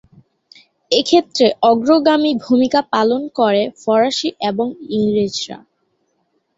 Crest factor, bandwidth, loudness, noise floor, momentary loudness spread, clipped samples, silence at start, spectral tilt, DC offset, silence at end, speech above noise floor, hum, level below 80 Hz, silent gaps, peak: 16 dB; 8 kHz; -16 LUFS; -66 dBFS; 8 LU; under 0.1%; 0.9 s; -4.5 dB/octave; under 0.1%; 1 s; 51 dB; none; -58 dBFS; none; 0 dBFS